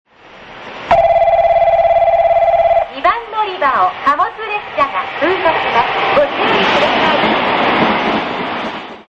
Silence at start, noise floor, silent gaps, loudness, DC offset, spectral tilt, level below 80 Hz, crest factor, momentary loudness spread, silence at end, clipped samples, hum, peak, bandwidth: 0.35 s; -37 dBFS; none; -13 LUFS; under 0.1%; -5 dB/octave; -42 dBFS; 12 dB; 8 LU; 0.05 s; under 0.1%; none; -2 dBFS; 7.4 kHz